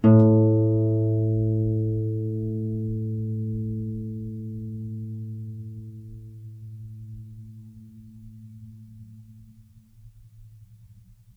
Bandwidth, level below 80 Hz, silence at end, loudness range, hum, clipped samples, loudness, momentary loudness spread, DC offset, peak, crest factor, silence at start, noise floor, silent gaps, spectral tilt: 3 kHz; -50 dBFS; 0.45 s; 23 LU; none; under 0.1%; -25 LUFS; 25 LU; under 0.1%; -6 dBFS; 20 dB; 0 s; -52 dBFS; none; -12.5 dB/octave